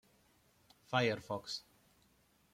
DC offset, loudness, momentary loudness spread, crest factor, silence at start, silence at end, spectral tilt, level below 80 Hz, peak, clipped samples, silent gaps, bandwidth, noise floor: under 0.1%; -38 LUFS; 11 LU; 22 dB; 0.9 s; 0.95 s; -5 dB/octave; -76 dBFS; -20 dBFS; under 0.1%; none; 16.5 kHz; -72 dBFS